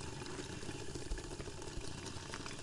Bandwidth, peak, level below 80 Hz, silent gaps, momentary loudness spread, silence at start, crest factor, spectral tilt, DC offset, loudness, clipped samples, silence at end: 11.5 kHz; -26 dBFS; -52 dBFS; none; 1 LU; 0 s; 18 dB; -4 dB/octave; under 0.1%; -46 LUFS; under 0.1%; 0 s